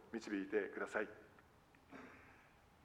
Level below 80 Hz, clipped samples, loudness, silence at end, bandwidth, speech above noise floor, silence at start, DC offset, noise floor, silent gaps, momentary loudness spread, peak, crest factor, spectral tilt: -78 dBFS; under 0.1%; -44 LUFS; 0 s; 14.5 kHz; 25 dB; 0 s; under 0.1%; -68 dBFS; none; 22 LU; -26 dBFS; 22 dB; -5 dB/octave